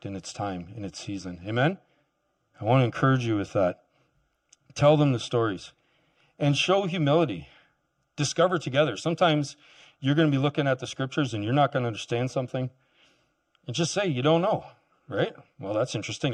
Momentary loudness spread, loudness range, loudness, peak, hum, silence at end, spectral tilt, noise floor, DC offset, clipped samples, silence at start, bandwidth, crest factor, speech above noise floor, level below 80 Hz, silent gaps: 13 LU; 3 LU; -26 LUFS; -8 dBFS; none; 0 s; -5.5 dB/octave; -74 dBFS; under 0.1%; under 0.1%; 0.05 s; 10 kHz; 18 dB; 49 dB; -64 dBFS; none